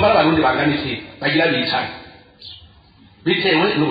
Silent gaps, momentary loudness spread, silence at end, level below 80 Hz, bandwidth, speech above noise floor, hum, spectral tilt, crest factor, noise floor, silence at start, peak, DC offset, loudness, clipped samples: none; 22 LU; 0 s; -50 dBFS; 5 kHz; 32 dB; none; -8.5 dB/octave; 16 dB; -49 dBFS; 0 s; -4 dBFS; under 0.1%; -18 LUFS; under 0.1%